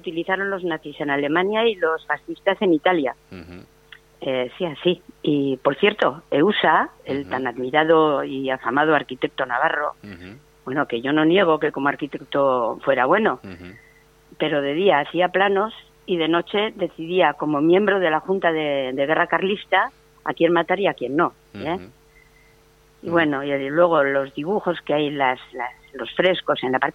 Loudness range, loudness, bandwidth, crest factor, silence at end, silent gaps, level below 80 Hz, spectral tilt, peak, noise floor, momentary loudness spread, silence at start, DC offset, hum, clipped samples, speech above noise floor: 4 LU; -21 LUFS; 7.8 kHz; 18 dB; 0.05 s; none; -60 dBFS; -7 dB/octave; -2 dBFS; -54 dBFS; 11 LU; 0.05 s; under 0.1%; none; under 0.1%; 34 dB